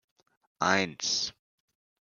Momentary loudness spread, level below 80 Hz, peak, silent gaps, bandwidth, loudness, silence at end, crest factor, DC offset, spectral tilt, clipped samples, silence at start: 5 LU; -72 dBFS; -8 dBFS; none; 11 kHz; -28 LUFS; 0.8 s; 26 dB; under 0.1%; -2 dB/octave; under 0.1%; 0.6 s